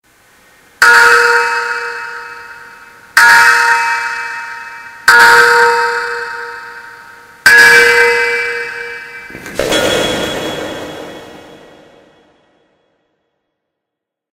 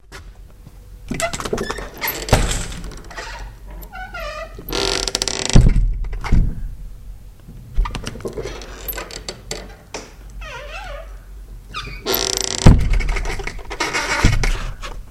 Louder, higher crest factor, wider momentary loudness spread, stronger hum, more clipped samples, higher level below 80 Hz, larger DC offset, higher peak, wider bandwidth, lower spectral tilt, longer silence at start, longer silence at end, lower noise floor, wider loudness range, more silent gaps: first, -8 LUFS vs -21 LUFS; second, 12 dB vs 20 dB; about the same, 23 LU vs 23 LU; neither; first, 0.6% vs under 0.1%; second, -46 dBFS vs -22 dBFS; neither; about the same, 0 dBFS vs 0 dBFS; first, over 20 kHz vs 14.5 kHz; second, -1 dB/octave vs -4 dB/octave; first, 0.8 s vs 0.1 s; first, 2.95 s vs 0 s; first, -79 dBFS vs -40 dBFS; about the same, 10 LU vs 11 LU; neither